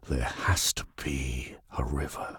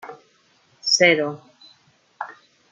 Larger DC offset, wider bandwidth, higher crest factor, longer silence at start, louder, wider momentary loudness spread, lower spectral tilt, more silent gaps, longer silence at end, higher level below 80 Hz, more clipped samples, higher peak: neither; first, 17.5 kHz vs 11 kHz; about the same, 18 dB vs 22 dB; about the same, 0 s vs 0.05 s; second, -31 LUFS vs -18 LUFS; second, 10 LU vs 24 LU; first, -3.5 dB/octave vs -2 dB/octave; neither; second, 0 s vs 0.4 s; first, -38 dBFS vs -76 dBFS; neither; second, -14 dBFS vs -2 dBFS